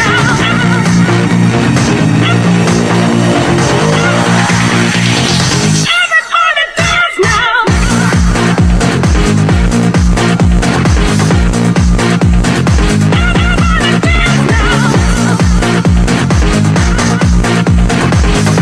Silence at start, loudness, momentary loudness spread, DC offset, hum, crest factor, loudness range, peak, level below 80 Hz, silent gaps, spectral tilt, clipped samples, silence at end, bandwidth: 0 s; -9 LUFS; 1 LU; under 0.1%; none; 8 dB; 1 LU; 0 dBFS; -16 dBFS; none; -5 dB/octave; under 0.1%; 0 s; 13 kHz